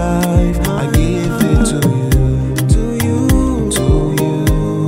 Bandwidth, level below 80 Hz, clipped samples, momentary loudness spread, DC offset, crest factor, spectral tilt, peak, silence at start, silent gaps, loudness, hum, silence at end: 16.5 kHz; -20 dBFS; under 0.1%; 3 LU; under 0.1%; 12 dB; -6.5 dB/octave; 0 dBFS; 0 s; none; -14 LUFS; none; 0 s